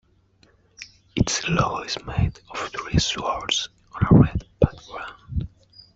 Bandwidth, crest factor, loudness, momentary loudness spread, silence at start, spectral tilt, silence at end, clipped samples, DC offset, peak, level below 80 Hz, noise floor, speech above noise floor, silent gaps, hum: 8 kHz; 22 dB; -23 LUFS; 19 LU; 0.8 s; -5 dB/octave; 0.5 s; under 0.1%; under 0.1%; -2 dBFS; -38 dBFS; -59 dBFS; 38 dB; none; none